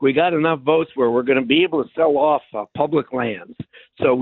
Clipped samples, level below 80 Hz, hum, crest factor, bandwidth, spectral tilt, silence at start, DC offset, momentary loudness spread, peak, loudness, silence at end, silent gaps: under 0.1%; -58 dBFS; none; 16 dB; 4.2 kHz; -10.5 dB/octave; 0 s; under 0.1%; 14 LU; -2 dBFS; -19 LUFS; 0 s; none